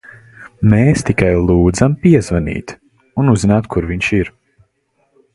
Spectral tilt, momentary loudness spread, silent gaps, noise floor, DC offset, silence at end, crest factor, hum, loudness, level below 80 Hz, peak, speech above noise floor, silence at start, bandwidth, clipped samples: -7 dB/octave; 12 LU; none; -62 dBFS; under 0.1%; 1.05 s; 14 dB; none; -14 LUFS; -30 dBFS; 0 dBFS; 50 dB; 0.4 s; 11.5 kHz; under 0.1%